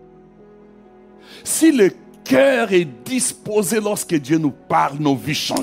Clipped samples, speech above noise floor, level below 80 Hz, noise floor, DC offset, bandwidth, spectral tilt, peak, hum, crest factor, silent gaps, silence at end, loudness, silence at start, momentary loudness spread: under 0.1%; 28 dB; -60 dBFS; -45 dBFS; under 0.1%; 16 kHz; -4 dB/octave; -4 dBFS; none; 16 dB; none; 0 s; -18 LUFS; 1.3 s; 7 LU